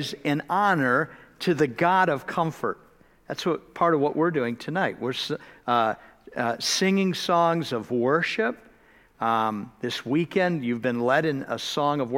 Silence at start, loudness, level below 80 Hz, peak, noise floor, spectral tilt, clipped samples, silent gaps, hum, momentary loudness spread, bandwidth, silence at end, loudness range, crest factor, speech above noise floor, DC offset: 0 s; -25 LUFS; -64 dBFS; -8 dBFS; -56 dBFS; -5 dB/octave; under 0.1%; none; none; 9 LU; 16.5 kHz; 0 s; 2 LU; 18 dB; 32 dB; under 0.1%